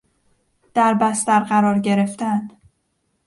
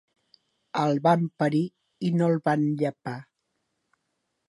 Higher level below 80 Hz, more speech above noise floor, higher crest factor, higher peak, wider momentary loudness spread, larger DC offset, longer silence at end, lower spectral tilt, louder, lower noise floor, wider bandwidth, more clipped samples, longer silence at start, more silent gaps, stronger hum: first, -64 dBFS vs -76 dBFS; about the same, 52 dB vs 54 dB; about the same, 18 dB vs 20 dB; first, -2 dBFS vs -8 dBFS; second, 8 LU vs 13 LU; neither; second, 0.8 s vs 1.25 s; second, -5.5 dB/octave vs -8 dB/octave; first, -18 LUFS vs -25 LUFS; second, -69 dBFS vs -78 dBFS; about the same, 11.5 kHz vs 11.5 kHz; neither; about the same, 0.75 s vs 0.75 s; neither; neither